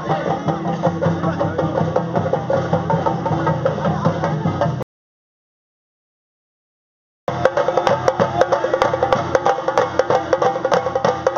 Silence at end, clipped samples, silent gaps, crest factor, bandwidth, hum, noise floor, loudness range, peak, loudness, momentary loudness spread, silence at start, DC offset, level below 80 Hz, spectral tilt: 0 s; under 0.1%; 4.83-7.27 s; 20 dB; 7.4 kHz; none; under -90 dBFS; 8 LU; 0 dBFS; -19 LUFS; 4 LU; 0 s; under 0.1%; -50 dBFS; -5.5 dB/octave